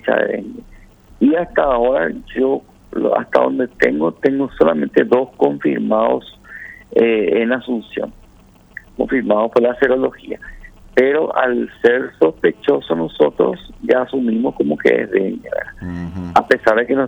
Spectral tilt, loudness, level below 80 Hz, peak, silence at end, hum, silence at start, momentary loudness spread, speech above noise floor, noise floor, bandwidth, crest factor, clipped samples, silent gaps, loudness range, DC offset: -7 dB/octave; -17 LUFS; -46 dBFS; 0 dBFS; 0 s; none; 0.05 s; 13 LU; 31 dB; -47 dBFS; 8.2 kHz; 16 dB; under 0.1%; none; 3 LU; under 0.1%